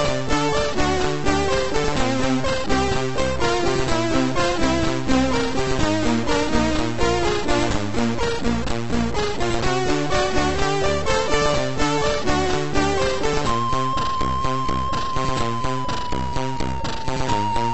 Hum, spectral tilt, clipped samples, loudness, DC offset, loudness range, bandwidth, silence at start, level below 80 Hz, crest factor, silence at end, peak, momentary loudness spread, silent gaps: none; -4.5 dB/octave; under 0.1%; -22 LUFS; 5%; 2 LU; 8.4 kHz; 0 s; -32 dBFS; 16 dB; 0 s; -6 dBFS; 4 LU; none